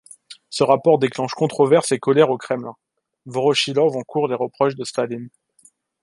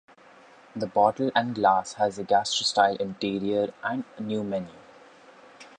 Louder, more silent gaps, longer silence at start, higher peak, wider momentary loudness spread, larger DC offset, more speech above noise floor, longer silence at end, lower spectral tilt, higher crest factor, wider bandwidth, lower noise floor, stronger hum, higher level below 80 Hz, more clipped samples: first, -19 LUFS vs -26 LUFS; neither; second, 0.3 s vs 0.75 s; first, -2 dBFS vs -6 dBFS; about the same, 11 LU vs 10 LU; neither; first, 37 dB vs 27 dB; first, 0.75 s vs 0.15 s; about the same, -5 dB/octave vs -4 dB/octave; about the same, 18 dB vs 20 dB; first, 11.5 kHz vs 10 kHz; about the same, -56 dBFS vs -53 dBFS; neither; about the same, -68 dBFS vs -66 dBFS; neither